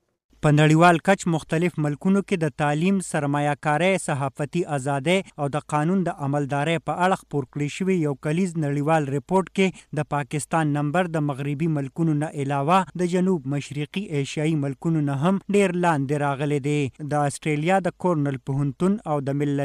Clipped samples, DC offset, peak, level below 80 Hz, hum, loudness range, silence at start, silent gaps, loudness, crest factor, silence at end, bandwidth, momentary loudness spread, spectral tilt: under 0.1%; under 0.1%; -6 dBFS; -58 dBFS; none; 2 LU; 0.45 s; none; -23 LUFS; 16 dB; 0 s; 13 kHz; 6 LU; -6.5 dB/octave